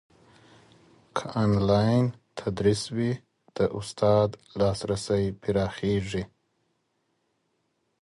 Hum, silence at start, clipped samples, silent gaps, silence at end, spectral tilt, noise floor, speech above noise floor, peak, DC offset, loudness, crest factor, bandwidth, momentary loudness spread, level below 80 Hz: none; 1.15 s; under 0.1%; none; 1.75 s; -6.5 dB/octave; -75 dBFS; 49 dB; -10 dBFS; under 0.1%; -27 LUFS; 18 dB; 11.5 kHz; 12 LU; -50 dBFS